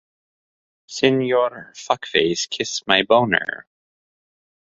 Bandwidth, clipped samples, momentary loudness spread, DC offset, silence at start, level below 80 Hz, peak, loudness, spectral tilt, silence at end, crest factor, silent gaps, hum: 7.8 kHz; under 0.1%; 14 LU; under 0.1%; 0.9 s; -60 dBFS; 0 dBFS; -19 LUFS; -3.5 dB/octave; 1.15 s; 22 dB; none; none